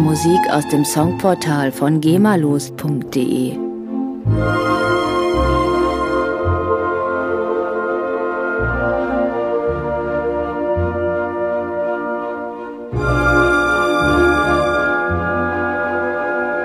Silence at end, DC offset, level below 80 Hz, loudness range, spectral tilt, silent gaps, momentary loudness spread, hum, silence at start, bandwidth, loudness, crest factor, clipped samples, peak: 0 s; under 0.1%; -32 dBFS; 4 LU; -6 dB/octave; none; 8 LU; none; 0 s; 15.5 kHz; -17 LUFS; 16 dB; under 0.1%; -2 dBFS